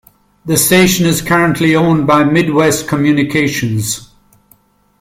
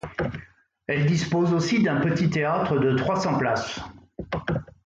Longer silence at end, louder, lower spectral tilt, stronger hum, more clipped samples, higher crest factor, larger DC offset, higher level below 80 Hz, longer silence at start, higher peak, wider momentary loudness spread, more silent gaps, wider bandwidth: first, 0.95 s vs 0.2 s; first, -12 LUFS vs -24 LUFS; second, -4.5 dB/octave vs -6.5 dB/octave; neither; neither; about the same, 12 dB vs 12 dB; neither; first, -44 dBFS vs -50 dBFS; first, 0.45 s vs 0.05 s; first, 0 dBFS vs -12 dBFS; second, 8 LU vs 13 LU; neither; first, 16.5 kHz vs 7.8 kHz